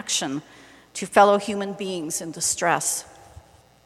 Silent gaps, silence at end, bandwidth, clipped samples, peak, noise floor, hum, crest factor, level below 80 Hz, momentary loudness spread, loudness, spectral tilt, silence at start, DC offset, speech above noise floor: none; 0.45 s; 15 kHz; under 0.1%; -2 dBFS; -50 dBFS; none; 22 dB; -62 dBFS; 14 LU; -22 LUFS; -2.5 dB/octave; 0 s; under 0.1%; 27 dB